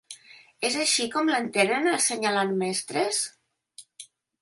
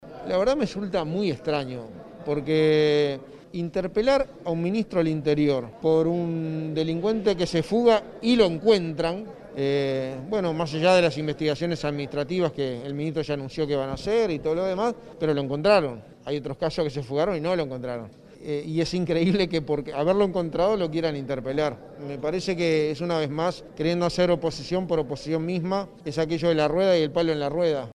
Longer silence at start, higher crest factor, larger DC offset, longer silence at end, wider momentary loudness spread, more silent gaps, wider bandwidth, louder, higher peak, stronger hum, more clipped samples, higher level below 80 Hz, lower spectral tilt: about the same, 0.1 s vs 0 s; about the same, 20 dB vs 18 dB; neither; first, 0.35 s vs 0 s; first, 18 LU vs 9 LU; neither; about the same, 12 kHz vs 11 kHz; about the same, -25 LUFS vs -25 LUFS; about the same, -8 dBFS vs -8 dBFS; neither; neither; second, -76 dBFS vs -50 dBFS; second, -2 dB/octave vs -6.5 dB/octave